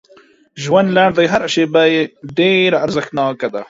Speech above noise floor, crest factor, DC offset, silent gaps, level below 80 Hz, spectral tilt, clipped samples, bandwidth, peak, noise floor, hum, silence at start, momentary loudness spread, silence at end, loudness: 34 dB; 14 dB; under 0.1%; none; -54 dBFS; -5 dB/octave; under 0.1%; 7.8 kHz; 0 dBFS; -48 dBFS; none; 0.55 s; 7 LU; 0.05 s; -14 LUFS